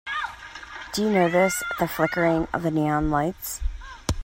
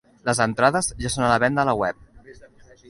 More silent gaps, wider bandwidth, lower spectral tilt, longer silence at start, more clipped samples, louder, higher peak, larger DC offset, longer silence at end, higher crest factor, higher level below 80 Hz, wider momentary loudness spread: neither; first, 16.5 kHz vs 11.5 kHz; about the same, -5 dB/octave vs -4 dB/octave; second, 0.05 s vs 0.25 s; neither; second, -24 LUFS vs -21 LUFS; second, -6 dBFS vs -2 dBFS; neither; second, 0 s vs 0.5 s; about the same, 18 dB vs 20 dB; first, -38 dBFS vs -46 dBFS; first, 14 LU vs 6 LU